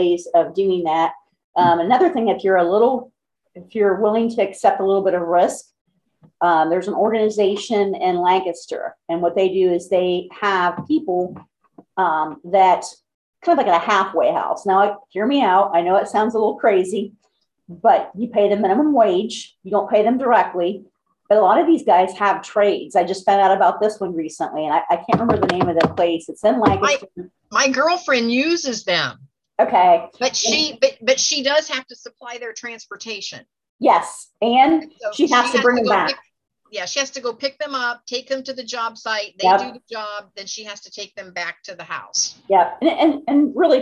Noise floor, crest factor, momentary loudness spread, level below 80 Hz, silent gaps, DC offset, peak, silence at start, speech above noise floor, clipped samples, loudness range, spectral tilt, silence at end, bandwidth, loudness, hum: -60 dBFS; 18 dB; 14 LU; -56 dBFS; 1.44-1.53 s, 5.81-5.85 s, 13.14-13.33 s, 33.69-33.79 s; under 0.1%; -2 dBFS; 0 s; 42 dB; under 0.1%; 5 LU; -3.5 dB/octave; 0 s; 11.5 kHz; -18 LUFS; none